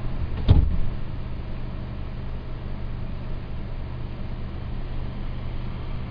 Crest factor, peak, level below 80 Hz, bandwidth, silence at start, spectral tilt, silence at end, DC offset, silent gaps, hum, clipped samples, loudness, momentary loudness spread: 22 dB; -4 dBFS; -28 dBFS; 5.2 kHz; 0 s; -10 dB/octave; 0 s; under 0.1%; none; none; under 0.1%; -30 LUFS; 14 LU